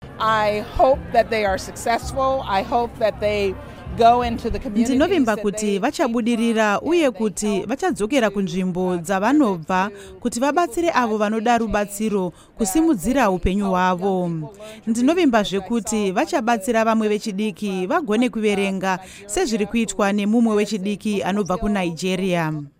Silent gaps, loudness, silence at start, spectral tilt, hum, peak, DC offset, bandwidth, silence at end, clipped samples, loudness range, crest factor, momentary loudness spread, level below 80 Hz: none; -20 LUFS; 0 s; -5 dB/octave; none; -2 dBFS; under 0.1%; 16 kHz; 0.1 s; under 0.1%; 1 LU; 18 dB; 7 LU; -40 dBFS